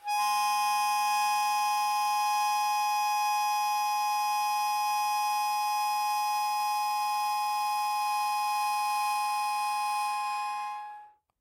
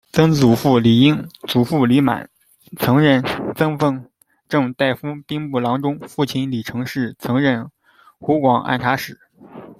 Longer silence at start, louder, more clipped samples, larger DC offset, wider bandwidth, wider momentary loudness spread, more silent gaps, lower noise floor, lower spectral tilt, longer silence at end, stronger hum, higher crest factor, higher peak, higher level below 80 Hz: about the same, 0.05 s vs 0.15 s; second, -28 LUFS vs -18 LUFS; neither; neither; about the same, 16 kHz vs 16 kHz; second, 3 LU vs 11 LU; neither; first, -50 dBFS vs -40 dBFS; second, 3.5 dB/octave vs -6.5 dB/octave; first, 0.3 s vs 0.05 s; neither; second, 12 dB vs 18 dB; second, -16 dBFS vs 0 dBFS; second, -82 dBFS vs -54 dBFS